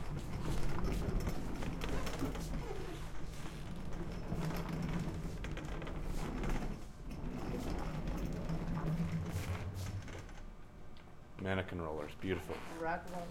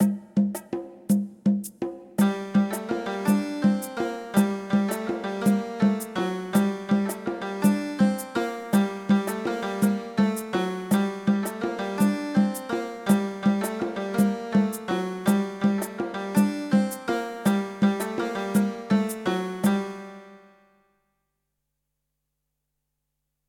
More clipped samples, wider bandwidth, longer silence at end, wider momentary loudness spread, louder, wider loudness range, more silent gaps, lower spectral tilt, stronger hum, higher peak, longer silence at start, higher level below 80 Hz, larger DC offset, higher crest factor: neither; about the same, 16.5 kHz vs 17.5 kHz; second, 0 s vs 3.1 s; first, 9 LU vs 6 LU; second, -42 LUFS vs -26 LUFS; about the same, 2 LU vs 2 LU; neither; about the same, -6.5 dB/octave vs -6 dB/octave; neither; second, -20 dBFS vs -6 dBFS; about the same, 0 s vs 0 s; first, -44 dBFS vs -64 dBFS; neither; about the same, 18 dB vs 18 dB